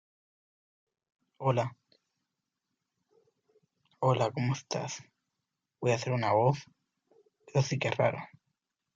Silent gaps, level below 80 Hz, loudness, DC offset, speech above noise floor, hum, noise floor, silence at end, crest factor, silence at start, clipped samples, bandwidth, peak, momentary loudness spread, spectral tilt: none; -74 dBFS; -31 LUFS; under 0.1%; 57 dB; none; -86 dBFS; 0.7 s; 20 dB; 1.4 s; under 0.1%; 7.6 kHz; -14 dBFS; 11 LU; -6 dB/octave